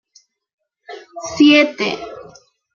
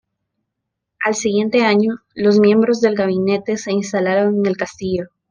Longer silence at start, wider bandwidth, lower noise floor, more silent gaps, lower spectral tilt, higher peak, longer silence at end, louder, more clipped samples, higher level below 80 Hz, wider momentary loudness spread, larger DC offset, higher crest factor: about the same, 0.9 s vs 1 s; second, 7.2 kHz vs 9.8 kHz; second, -55 dBFS vs -78 dBFS; neither; second, -3.5 dB/octave vs -5.5 dB/octave; about the same, -2 dBFS vs -2 dBFS; first, 0.55 s vs 0.25 s; first, -13 LUFS vs -17 LUFS; neither; about the same, -60 dBFS vs -58 dBFS; first, 26 LU vs 9 LU; neither; about the same, 18 dB vs 14 dB